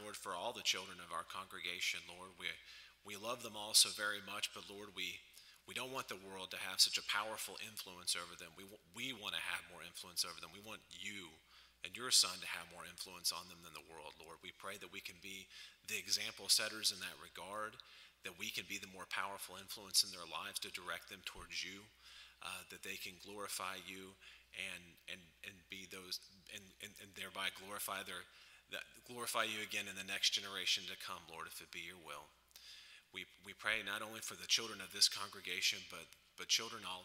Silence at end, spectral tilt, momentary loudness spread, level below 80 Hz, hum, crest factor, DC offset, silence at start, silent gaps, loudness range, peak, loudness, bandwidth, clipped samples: 0 s; 0.5 dB/octave; 20 LU; -78 dBFS; none; 28 dB; under 0.1%; 0 s; none; 9 LU; -16 dBFS; -40 LUFS; 16 kHz; under 0.1%